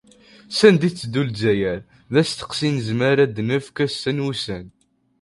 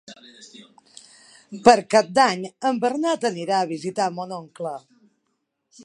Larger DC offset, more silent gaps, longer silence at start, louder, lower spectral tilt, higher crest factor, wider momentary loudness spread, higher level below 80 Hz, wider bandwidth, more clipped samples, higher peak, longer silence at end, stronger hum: neither; neither; first, 0.5 s vs 0.1 s; about the same, -20 LUFS vs -21 LUFS; first, -5.5 dB/octave vs -4 dB/octave; about the same, 20 dB vs 24 dB; second, 11 LU vs 16 LU; first, -52 dBFS vs -66 dBFS; about the same, 11.5 kHz vs 11.5 kHz; neither; about the same, 0 dBFS vs 0 dBFS; first, 0.55 s vs 0 s; neither